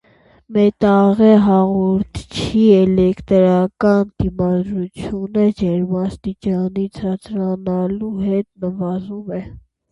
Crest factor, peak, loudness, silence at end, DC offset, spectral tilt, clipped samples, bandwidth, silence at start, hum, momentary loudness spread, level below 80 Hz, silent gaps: 16 dB; 0 dBFS; -17 LUFS; 0.3 s; under 0.1%; -8.5 dB/octave; under 0.1%; 11 kHz; 0.5 s; none; 13 LU; -42 dBFS; none